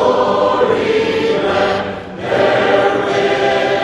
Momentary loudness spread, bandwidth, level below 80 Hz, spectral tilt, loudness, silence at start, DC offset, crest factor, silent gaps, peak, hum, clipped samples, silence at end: 5 LU; 11.5 kHz; -46 dBFS; -5 dB/octave; -14 LUFS; 0 s; under 0.1%; 14 dB; none; 0 dBFS; none; under 0.1%; 0 s